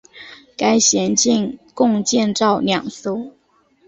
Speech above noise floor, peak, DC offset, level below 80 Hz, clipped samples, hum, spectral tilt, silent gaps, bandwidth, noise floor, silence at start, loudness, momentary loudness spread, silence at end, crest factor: 41 dB; -2 dBFS; under 0.1%; -58 dBFS; under 0.1%; none; -3 dB/octave; none; 8.2 kHz; -58 dBFS; 0.15 s; -17 LUFS; 20 LU; 0.6 s; 16 dB